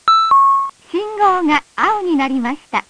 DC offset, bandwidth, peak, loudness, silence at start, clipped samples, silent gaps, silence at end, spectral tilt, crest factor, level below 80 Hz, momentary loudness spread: under 0.1%; 10.5 kHz; 0 dBFS; -15 LUFS; 0.05 s; under 0.1%; none; 0.1 s; -3.5 dB/octave; 14 dB; -56 dBFS; 11 LU